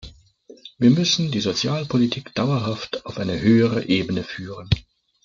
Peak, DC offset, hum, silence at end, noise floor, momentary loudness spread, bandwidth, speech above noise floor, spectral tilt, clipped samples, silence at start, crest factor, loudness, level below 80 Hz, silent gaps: -4 dBFS; under 0.1%; none; 0.45 s; -49 dBFS; 10 LU; 7.6 kHz; 28 dB; -5.5 dB/octave; under 0.1%; 0.05 s; 18 dB; -21 LUFS; -46 dBFS; none